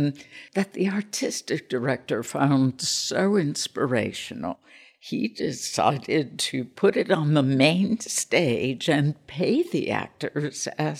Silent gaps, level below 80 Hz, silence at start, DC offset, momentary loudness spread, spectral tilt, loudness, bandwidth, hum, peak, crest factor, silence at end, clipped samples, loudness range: none; -66 dBFS; 0 s; under 0.1%; 9 LU; -4.5 dB/octave; -25 LUFS; 15.5 kHz; none; -4 dBFS; 20 dB; 0 s; under 0.1%; 4 LU